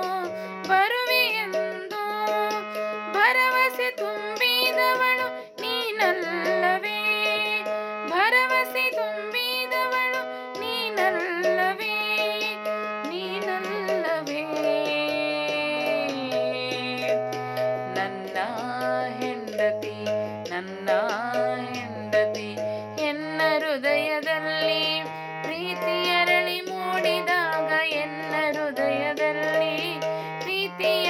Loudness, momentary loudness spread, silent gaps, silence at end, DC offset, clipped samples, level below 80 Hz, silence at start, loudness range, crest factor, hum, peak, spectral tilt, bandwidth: -25 LUFS; 9 LU; none; 0 s; under 0.1%; under 0.1%; -88 dBFS; 0 s; 5 LU; 18 dB; none; -6 dBFS; -3.5 dB/octave; 17 kHz